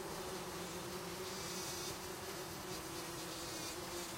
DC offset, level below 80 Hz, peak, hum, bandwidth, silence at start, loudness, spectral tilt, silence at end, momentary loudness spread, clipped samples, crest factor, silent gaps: under 0.1%; -64 dBFS; -30 dBFS; none; 16 kHz; 0 s; -44 LUFS; -2.5 dB/octave; 0 s; 3 LU; under 0.1%; 14 dB; none